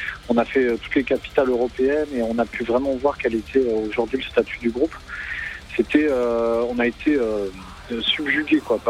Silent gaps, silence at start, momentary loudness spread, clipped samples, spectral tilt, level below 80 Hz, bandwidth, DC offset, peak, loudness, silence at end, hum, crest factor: none; 0 s; 8 LU; under 0.1%; -5.5 dB/octave; -44 dBFS; 13 kHz; under 0.1%; -4 dBFS; -22 LUFS; 0 s; none; 18 dB